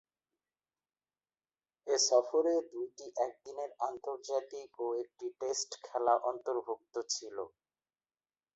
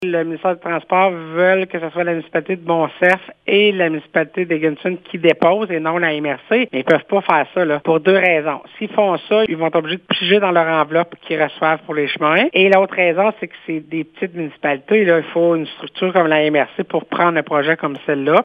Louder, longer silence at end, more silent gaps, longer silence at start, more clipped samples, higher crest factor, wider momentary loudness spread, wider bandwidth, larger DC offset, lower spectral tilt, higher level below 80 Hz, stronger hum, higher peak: second, -35 LUFS vs -16 LUFS; first, 1.05 s vs 0 s; neither; first, 1.85 s vs 0 s; neither; first, 22 dB vs 16 dB; first, 15 LU vs 9 LU; first, 8 kHz vs 6.2 kHz; neither; second, -0.5 dB/octave vs -7.5 dB/octave; second, -84 dBFS vs -68 dBFS; neither; second, -14 dBFS vs 0 dBFS